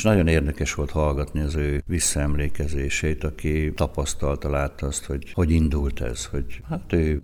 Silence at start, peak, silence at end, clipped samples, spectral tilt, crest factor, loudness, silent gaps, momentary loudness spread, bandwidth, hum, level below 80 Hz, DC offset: 0 s; -6 dBFS; 0 s; under 0.1%; -5.5 dB/octave; 18 dB; -25 LUFS; none; 8 LU; 19 kHz; none; -28 dBFS; under 0.1%